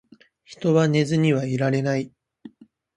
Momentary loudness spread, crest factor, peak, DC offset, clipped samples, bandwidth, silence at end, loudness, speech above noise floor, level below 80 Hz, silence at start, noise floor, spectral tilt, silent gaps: 9 LU; 18 dB; -6 dBFS; under 0.1%; under 0.1%; 9.6 kHz; 0.5 s; -22 LUFS; 30 dB; -64 dBFS; 0.5 s; -51 dBFS; -7 dB/octave; none